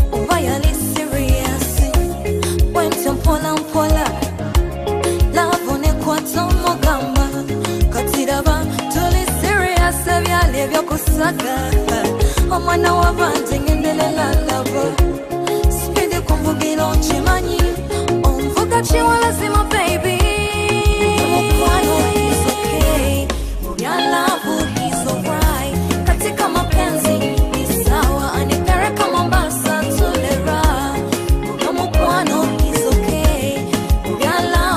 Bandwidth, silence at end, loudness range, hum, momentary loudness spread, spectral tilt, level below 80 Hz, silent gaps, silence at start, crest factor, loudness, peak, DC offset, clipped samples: 15.5 kHz; 0 s; 2 LU; none; 4 LU; -5 dB/octave; -20 dBFS; none; 0 s; 14 dB; -17 LUFS; -2 dBFS; under 0.1%; under 0.1%